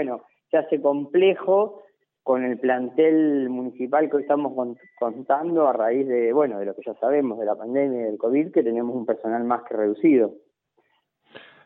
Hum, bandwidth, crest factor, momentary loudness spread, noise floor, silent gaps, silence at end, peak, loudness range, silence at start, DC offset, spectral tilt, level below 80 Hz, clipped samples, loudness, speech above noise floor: none; 3.9 kHz; 16 dB; 10 LU; -68 dBFS; none; 0.25 s; -8 dBFS; 2 LU; 0 s; under 0.1%; -10 dB/octave; -80 dBFS; under 0.1%; -23 LUFS; 46 dB